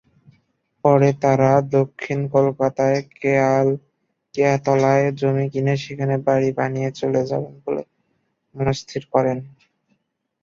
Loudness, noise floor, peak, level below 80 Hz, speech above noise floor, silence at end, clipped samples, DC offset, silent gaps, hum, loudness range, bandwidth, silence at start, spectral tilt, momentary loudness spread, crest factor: -20 LUFS; -70 dBFS; -2 dBFS; -56 dBFS; 51 dB; 0.95 s; under 0.1%; under 0.1%; none; none; 6 LU; 7.4 kHz; 0.85 s; -7.5 dB/octave; 10 LU; 18 dB